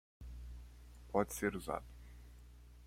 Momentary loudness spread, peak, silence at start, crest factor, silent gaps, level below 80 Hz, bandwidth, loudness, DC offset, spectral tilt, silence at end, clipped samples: 21 LU; -18 dBFS; 0.2 s; 26 dB; none; -54 dBFS; 16.5 kHz; -40 LUFS; under 0.1%; -5.5 dB/octave; 0 s; under 0.1%